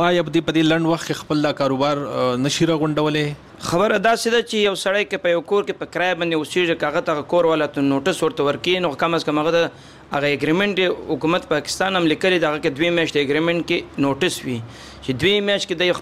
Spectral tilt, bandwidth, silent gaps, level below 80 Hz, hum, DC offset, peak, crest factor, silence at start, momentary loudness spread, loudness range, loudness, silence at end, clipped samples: -4.5 dB/octave; 15.5 kHz; none; -52 dBFS; none; 0.1%; -2 dBFS; 16 dB; 0 s; 5 LU; 1 LU; -20 LUFS; 0 s; under 0.1%